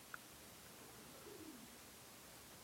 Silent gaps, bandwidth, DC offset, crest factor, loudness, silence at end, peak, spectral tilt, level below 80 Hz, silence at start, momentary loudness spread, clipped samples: none; 16.5 kHz; under 0.1%; 24 dB; -57 LUFS; 0 s; -34 dBFS; -2.5 dB/octave; -78 dBFS; 0 s; 2 LU; under 0.1%